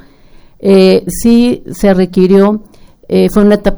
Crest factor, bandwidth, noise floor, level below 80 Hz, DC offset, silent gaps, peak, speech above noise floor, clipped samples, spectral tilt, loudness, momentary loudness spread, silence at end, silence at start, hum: 10 dB; over 20 kHz; -38 dBFS; -28 dBFS; under 0.1%; none; 0 dBFS; 30 dB; 0.7%; -6.5 dB/octave; -9 LUFS; 7 LU; 0 s; 0.6 s; none